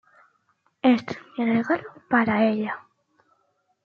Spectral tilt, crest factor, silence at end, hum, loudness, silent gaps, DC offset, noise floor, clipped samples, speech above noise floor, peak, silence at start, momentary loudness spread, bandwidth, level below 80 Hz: -7 dB/octave; 18 dB; 1.1 s; none; -24 LUFS; none; under 0.1%; -70 dBFS; under 0.1%; 47 dB; -8 dBFS; 0.85 s; 10 LU; 6.8 kHz; -68 dBFS